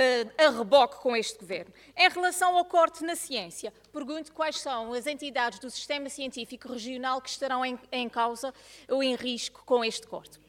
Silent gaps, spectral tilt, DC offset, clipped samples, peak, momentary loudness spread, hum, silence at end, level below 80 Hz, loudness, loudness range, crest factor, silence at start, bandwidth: none; -2 dB/octave; under 0.1%; under 0.1%; -8 dBFS; 15 LU; none; 0.25 s; -68 dBFS; -28 LUFS; 8 LU; 20 dB; 0 s; 17.5 kHz